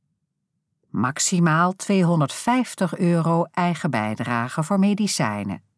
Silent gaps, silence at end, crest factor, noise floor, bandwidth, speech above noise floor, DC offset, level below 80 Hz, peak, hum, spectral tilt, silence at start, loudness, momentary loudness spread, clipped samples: none; 0.2 s; 16 dB; -76 dBFS; 11 kHz; 55 dB; under 0.1%; -70 dBFS; -6 dBFS; none; -5 dB/octave; 0.95 s; -22 LUFS; 6 LU; under 0.1%